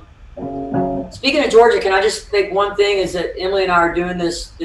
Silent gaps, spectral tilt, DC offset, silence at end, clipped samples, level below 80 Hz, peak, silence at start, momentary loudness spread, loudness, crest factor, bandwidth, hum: none; -4.5 dB/octave; under 0.1%; 0 s; under 0.1%; -40 dBFS; 0 dBFS; 0.2 s; 11 LU; -16 LUFS; 16 dB; 12 kHz; none